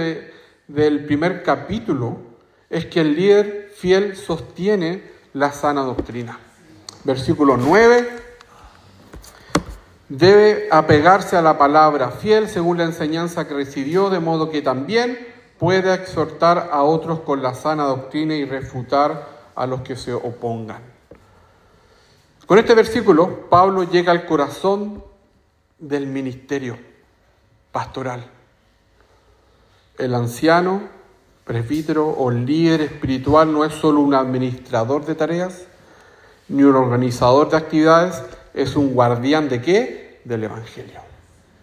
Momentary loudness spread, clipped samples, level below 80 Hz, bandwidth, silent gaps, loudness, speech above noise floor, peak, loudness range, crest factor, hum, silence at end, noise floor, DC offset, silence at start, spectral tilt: 15 LU; under 0.1%; -48 dBFS; 15.5 kHz; none; -18 LUFS; 42 dB; 0 dBFS; 10 LU; 18 dB; none; 0.6 s; -59 dBFS; under 0.1%; 0 s; -6.5 dB/octave